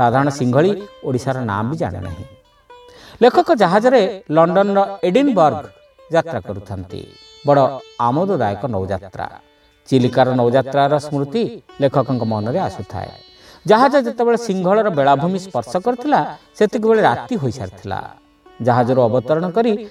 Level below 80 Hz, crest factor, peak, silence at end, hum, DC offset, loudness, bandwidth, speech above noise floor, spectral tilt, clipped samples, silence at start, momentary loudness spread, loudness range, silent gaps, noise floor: -54 dBFS; 16 dB; 0 dBFS; 0 s; none; under 0.1%; -17 LUFS; 13.5 kHz; 29 dB; -7 dB/octave; under 0.1%; 0 s; 15 LU; 4 LU; none; -45 dBFS